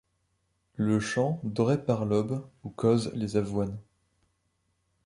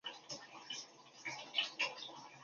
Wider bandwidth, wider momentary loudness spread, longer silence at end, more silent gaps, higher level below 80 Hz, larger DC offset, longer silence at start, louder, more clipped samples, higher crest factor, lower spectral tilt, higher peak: first, 11 kHz vs 7.4 kHz; about the same, 10 LU vs 11 LU; first, 1.25 s vs 0 s; neither; first, -58 dBFS vs under -90 dBFS; neither; first, 0.8 s vs 0.05 s; first, -29 LUFS vs -42 LUFS; neither; second, 18 dB vs 24 dB; first, -7 dB/octave vs 2 dB/octave; first, -12 dBFS vs -22 dBFS